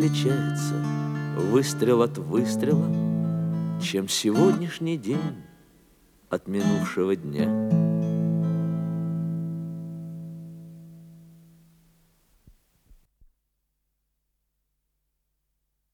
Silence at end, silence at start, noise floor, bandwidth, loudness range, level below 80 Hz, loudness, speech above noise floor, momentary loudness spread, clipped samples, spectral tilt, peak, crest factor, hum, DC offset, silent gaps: 4.7 s; 0 s; -77 dBFS; 15 kHz; 13 LU; -66 dBFS; -25 LUFS; 53 dB; 15 LU; under 0.1%; -6.5 dB/octave; -8 dBFS; 20 dB; none; under 0.1%; none